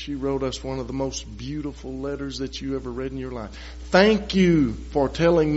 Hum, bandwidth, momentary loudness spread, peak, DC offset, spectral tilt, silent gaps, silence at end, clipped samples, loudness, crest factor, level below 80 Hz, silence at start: none; 8 kHz; 15 LU; -4 dBFS; under 0.1%; -5 dB/octave; none; 0 s; under 0.1%; -24 LUFS; 20 dB; -38 dBFS; 0 s